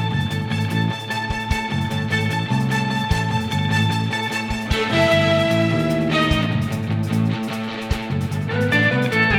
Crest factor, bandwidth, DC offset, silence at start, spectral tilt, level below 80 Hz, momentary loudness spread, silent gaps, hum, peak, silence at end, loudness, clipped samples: 16 dB; 16.5 kHz; under 0.1%; 0 s; -6 dB/octave; -36 dBFS; 7 LU; none; none; -4 dBFS; 0 s; -20 LUFS; under 0.1%